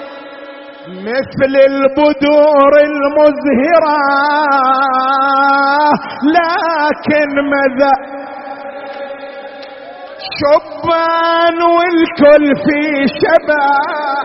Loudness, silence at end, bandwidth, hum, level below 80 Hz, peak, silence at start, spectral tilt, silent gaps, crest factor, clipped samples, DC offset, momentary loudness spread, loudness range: -11 LUFS; 0 s; 6 kHz; none; -50 dBFS; 0 dBFS; 0 s; -2.5 dB/octave; none; 12 dB; under 0.1%; under 0.1%; 19 LU; 7 LU